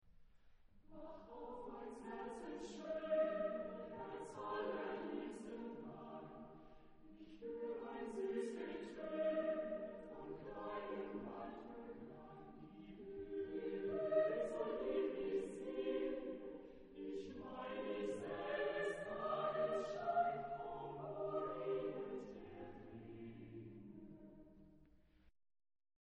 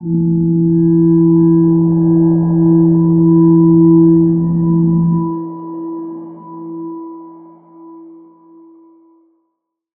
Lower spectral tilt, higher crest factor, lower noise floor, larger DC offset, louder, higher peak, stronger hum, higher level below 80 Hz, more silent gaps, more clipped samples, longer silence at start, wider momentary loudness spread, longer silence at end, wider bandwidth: second, -6 dB/octave vs -16.5 dB/octave; first, 20 dB vs 12 dB; about the same, -69 dBFS vs -71 dBFS; neither; second, -45 LUFS vs -11 LUFS; second, -26 dBFS vs -2 dBFS; neither; second, -70 dBFS vs -44 dBFS; neither; neither; about the same, 0.05 s vs 0 s; about the same, 17 LU vs 19 LU; second, 0.75 s vs 1.9 s; first, 10 kHz vs 1.7 kHz